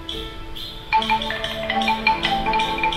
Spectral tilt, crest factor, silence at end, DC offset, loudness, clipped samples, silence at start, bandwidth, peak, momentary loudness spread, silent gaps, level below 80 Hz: -3.5 dB/octave; 20 dB; 0 s; under 0.1%; -21 LUFS; under 0.1%; 0 s; 15.5 kHz; -4 dBFS; 13 LU; none; -38 dBFS